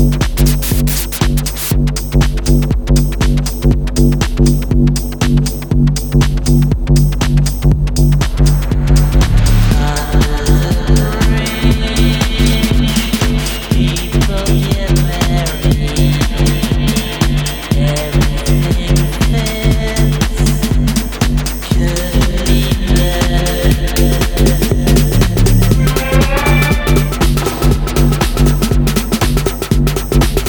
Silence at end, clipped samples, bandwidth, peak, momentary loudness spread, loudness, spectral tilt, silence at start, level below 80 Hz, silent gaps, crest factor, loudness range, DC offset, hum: 0 s; under 0.1%; over 20 kHz; 0 dBFS; 3 LU; -13 LUFS; -5.5 dB/octave; 0 s; -14 dBFS; none; 12 dB; 2 LU; under 0.1%; none